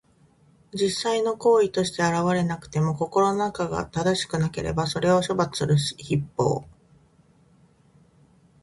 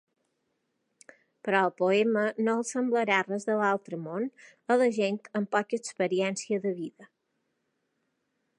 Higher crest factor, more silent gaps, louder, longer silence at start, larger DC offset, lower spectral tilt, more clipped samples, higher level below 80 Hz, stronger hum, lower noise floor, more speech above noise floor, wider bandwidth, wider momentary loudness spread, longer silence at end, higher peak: about the same, 18 dB vs 20 dB; neither; first, -24 LUFS vs -28 LUFS; second, 0.75 s vs 1.45 s; neither; about the same, -5.5 dB/octave vs -4.5 dB/octave; neither; first, -52 dBFS vs -84 dBFS; neither; second, -59 dBFS vs -78 dBFS; second, 35 dB vs 50 dB; about the same, 11.5 kHz vs 11.5 kHz; second, 6 LU vs 10 LU; first, 2 s vs 1.55 s; about the same, -8 dBFS vs -8 dBFS